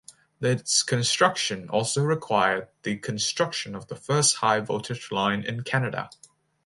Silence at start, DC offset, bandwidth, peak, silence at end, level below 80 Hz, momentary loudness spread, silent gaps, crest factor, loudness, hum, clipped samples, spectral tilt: 0.4 s; under 0.1%; 11.5 kHz; -4 dBFS; 0.55 s; -64 dBFS; 10 LU; none; 22 dB; -25 LUFS; none; under 0.1%; -3 dB/octave